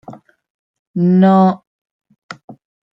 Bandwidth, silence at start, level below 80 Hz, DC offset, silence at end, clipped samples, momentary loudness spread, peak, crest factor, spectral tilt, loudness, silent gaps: 5.8 kHz; 0.1 s; -62 dBFS; under 0.1%; 0.4 s; under 0.1%; 25 LU; -2 dBFS; 14 dB; -10 dB/octave; -12 LUFS; 0.50-0.94 s, 1.67-1.85 s, 1.91-2.00 s, 2.18-2.29 s, 2.44-2.48 s